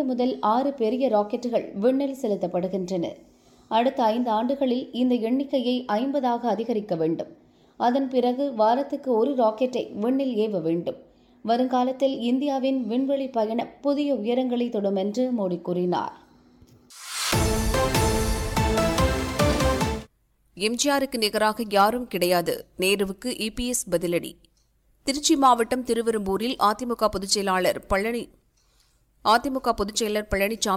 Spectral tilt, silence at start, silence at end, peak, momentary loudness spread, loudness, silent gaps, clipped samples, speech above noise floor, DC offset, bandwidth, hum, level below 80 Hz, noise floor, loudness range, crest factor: -4.5 dB/octave; 0 s; 0 s; -8 dBFS; 6 LU; -24 LUFS; none; under 0.1%; 40 dB; under 0.1%; 17.5 kHz; none; -40 dBFS; -64 dBFS; 2 LU; 16 dB